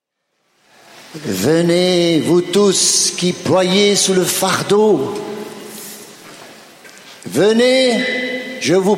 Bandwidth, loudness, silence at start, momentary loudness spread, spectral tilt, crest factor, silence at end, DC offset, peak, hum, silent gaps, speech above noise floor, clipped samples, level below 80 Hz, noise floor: 16.5 kHz; -14 LUFS; 0.95 s; 19 LU; -3.5 dB/octave; 14 dB; 0 s; under 0.1%; -2 dBFS; none; none; 54 dB; under 0.1%; -58 dBFS; -68 dBFS